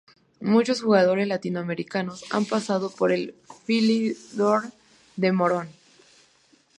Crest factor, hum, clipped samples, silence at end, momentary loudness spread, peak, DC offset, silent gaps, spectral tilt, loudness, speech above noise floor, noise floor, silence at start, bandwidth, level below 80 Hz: 18 dB; none; under 0.1%; 1.05 s; 11 LU; -6 dBFS; under 0.1%; none; -6 dB/octave; -24 LUFS; 37 dB; -61 dBFS; 0.4 s; 10.5 kHz; -72 dBFS